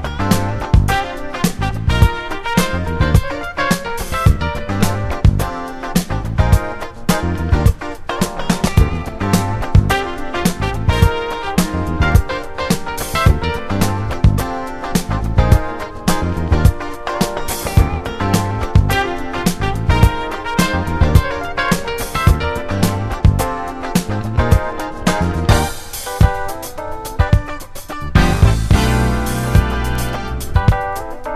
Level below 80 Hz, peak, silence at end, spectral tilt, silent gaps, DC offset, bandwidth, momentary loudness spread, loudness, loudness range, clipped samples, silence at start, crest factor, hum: -20 dBFS; 0 dBFS; 0 s; -5.5 dB/octave; none; under 0.1%; 14 kHz; 8 LU; -17 LUFS; 2 LU; under 0.1%; 0 s; 16 dB; none